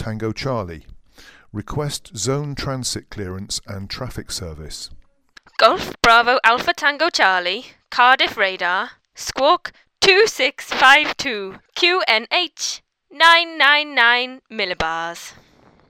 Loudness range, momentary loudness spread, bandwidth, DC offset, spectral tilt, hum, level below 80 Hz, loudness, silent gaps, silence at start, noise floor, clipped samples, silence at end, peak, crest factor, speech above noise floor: 11 LU; 18 LU; 17 kHz; under 0.1%; -2.5 dB/octave; none; -46 dBFS; -17 LUFS; none; 0 s; -51 dBFS; under 0.1%; 0.6 s; 0 dBFS; 20 dB; 32 dB